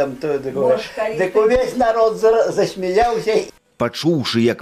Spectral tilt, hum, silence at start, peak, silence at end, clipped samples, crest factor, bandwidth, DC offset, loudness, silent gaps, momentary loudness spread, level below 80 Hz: -5.5 dB/octave; none; 0 s; -6 dBFS; 0 s; under 0.1%; 12 dB; 14.5 kHz; under 0.1%; -18 LUFS; none; 7 LU; -44 dBFS